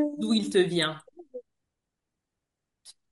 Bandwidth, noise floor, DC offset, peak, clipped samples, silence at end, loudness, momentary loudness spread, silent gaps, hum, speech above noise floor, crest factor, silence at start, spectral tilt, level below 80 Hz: 11.5 kHz; -85 dBFS; under 0.1%; -12 dBFS; under 0.1%; 0.2 s; -26 LUFS; 22 LU; none; none; 60 dB; 20 dB; 0 s; -5 dB/octave; -74 dBFS